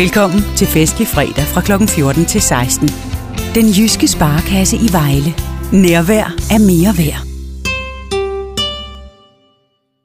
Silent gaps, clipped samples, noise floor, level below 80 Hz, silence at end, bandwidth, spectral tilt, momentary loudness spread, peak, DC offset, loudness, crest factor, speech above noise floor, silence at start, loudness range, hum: none; under 0.1%; -61 dBFS; -24 dBFS; 0.95 s; 15.5 kHz; -4.5 dB/octave; 11 LU; 0 dBFS; under 0.1%; -12 LUFS; 12 dB; 50 dB; 0 s; 4 LU; none